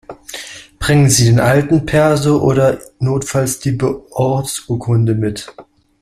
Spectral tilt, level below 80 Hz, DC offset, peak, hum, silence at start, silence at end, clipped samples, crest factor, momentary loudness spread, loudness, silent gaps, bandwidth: -5.5 dB/octave; -38 dBFS; under 0.1%; 0 dBFS; none; 0.1 s; 0.4 s; under 0.1%; 14 dB; 18 LU; -14 LUFS; none; 15 kHz